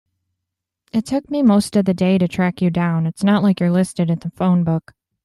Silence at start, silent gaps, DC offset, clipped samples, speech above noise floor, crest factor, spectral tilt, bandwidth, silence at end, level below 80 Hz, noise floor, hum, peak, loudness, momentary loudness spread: 0.95 s; none; under 0.1%; under 0.1%; 64 dB; 14 dB; -7.5 dB/octave; 12.5 kHz; 0.45 s; -54 dBFS; -81 dBFS; none; -4 dBFS; -18 LUFS; 6 LU